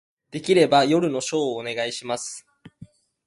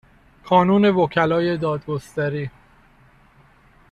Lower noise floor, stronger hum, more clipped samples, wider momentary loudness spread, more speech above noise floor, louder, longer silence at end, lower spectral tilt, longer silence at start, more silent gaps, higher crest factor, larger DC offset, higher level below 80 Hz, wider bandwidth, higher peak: second, -49 dBFS vs -53 dBFS; neither; neither; first, 16 LU vs 11 LU; second, 27 dB vs 34 dB; about the same, -22 LUFS vs -20 LUFS; second, 0.4 s vs 1.4 s; second, -4.5 dB/octave vs -7.5 dB/octave; about the same, 0.35 s vs 0.45 s; neither; about the same, 18 dB vs 18 dB; neither; second, -66 dBFS vs -54 dBFS; about the same, 11.5 kHz vs 11 kHz; about the same, -4 dBFS vs -4 dBFS